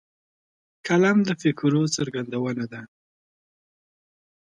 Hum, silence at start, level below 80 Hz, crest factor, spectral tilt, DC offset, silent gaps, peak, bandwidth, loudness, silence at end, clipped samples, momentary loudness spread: none; 0.85 s; -68 dBFS; 18 dB; -5.5 dB/octave; under 0.1%; none; -8 dBFS; 11 kHz; -23 LUFS; 1.55 s; under 0.1%; 15 LU